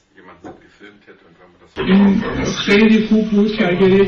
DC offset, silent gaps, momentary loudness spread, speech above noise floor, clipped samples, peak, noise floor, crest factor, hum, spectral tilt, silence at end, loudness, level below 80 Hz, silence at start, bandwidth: under 0.1%; none; 9 LU; 25 dB; under 0.1%; -4 dBFS; -39 dBFS; 12 dB; none; -6.5 dB/octave; 0 s; -14 LUFS; -42 dBFS; 0.45 s; 6.8 kHz